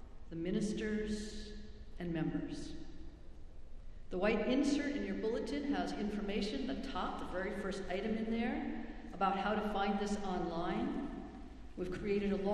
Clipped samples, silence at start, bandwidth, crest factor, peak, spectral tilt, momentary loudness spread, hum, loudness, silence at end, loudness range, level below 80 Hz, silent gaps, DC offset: under 0.1%; 0 s; 11.5 kHz; 18 dB; -20 dBFS; -6 dB/octave; 18 LU; none; -38 LUFS; 0 s; 4 LU; -52 dBFS; none; under 0.1%